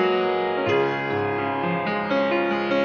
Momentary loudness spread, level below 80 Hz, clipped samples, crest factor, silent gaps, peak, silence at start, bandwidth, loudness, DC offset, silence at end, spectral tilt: 3 LU; -62 dBFS; under 0.1%; 14 dB; none; -8 dBFS; 0 s; 6.6 kHz; -23 LUFS; under 0.1%; 0 s; -7 dB/octave